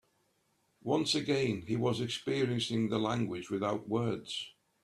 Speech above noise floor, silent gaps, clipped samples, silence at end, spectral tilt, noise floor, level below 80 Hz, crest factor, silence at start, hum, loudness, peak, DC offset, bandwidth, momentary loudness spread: 42 dB; none; under 0.1%; 0.35 s; -5.5 dB/octave; -75 dBFS; -68 dBFS; 16 dB; 0.85 s; none; -33 LUFS; -16 dBFS; under 0.1%; 13 kHz; 8 LU